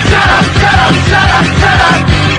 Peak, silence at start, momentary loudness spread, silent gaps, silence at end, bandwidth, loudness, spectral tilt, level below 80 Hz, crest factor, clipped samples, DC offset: 0 dBFS; 0 s; 1 LU; none; 0 s; 11 kHz; -7 LUFS; -5 dB/octave; -20 dBFS; 8 dB; 1%; under 0.1%